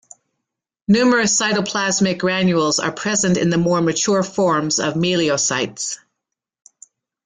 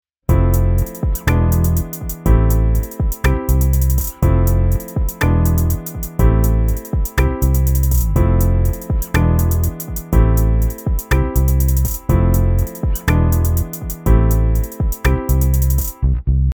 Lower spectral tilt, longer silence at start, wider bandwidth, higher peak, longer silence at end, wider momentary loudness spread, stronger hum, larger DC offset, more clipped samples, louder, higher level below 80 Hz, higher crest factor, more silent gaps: second, -3.5 dB/octave vs -7 dB/octave; first, 0.9 s vs 0.3 s; second, 9.6 kHz vs over 20 kHz; second, -4 dBFS vs 0 dBFS; first, 1.3 s vs 0 s; about the same, 6 LU vs 6 LU; neither; neither; neither; about the same, -17 LUFS vs -17 LUFS; second, -56 dBFS vs -16 dBFS; about the same, 14 dB vs 14 dB; neither